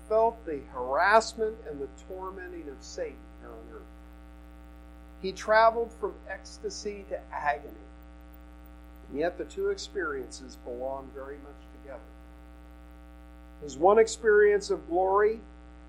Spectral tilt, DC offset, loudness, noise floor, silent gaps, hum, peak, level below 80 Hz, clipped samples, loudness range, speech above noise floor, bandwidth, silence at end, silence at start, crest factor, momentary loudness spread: -4 dB/octave; under 0.1%; -28 LUFS; -49 dBFS; none; none; -6 dBFS; -50 dBFS; under 0.1%; 16 LU; 20 dB; 15 kHz; 0 s; 0 s; 24 dB; 24 LU